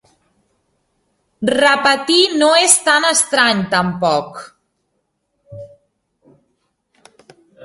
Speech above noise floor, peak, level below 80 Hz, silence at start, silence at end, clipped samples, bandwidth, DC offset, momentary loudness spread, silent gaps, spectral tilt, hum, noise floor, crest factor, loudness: 56 dB; 0 dBFS; -58 dBFS; 1.4 s; 0 s; under 0.1%; 16 kHz; under 0.1%; 10 LU; none; -2 dB/octave; none; -70 dBFS; 18 dB; -13 LUFS